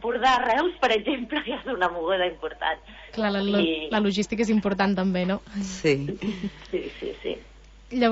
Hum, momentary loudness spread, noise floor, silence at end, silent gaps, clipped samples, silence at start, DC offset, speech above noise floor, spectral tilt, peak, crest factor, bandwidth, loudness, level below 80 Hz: none; 11 LU; -49 dBFS; 0 s; none; under 0.1%; 0 s; under 0.1%; 23 dB; -5.5 dB/octave; -10 dBFS; 16 dB; 8 kHz; -25 LUFS; -50 dBFS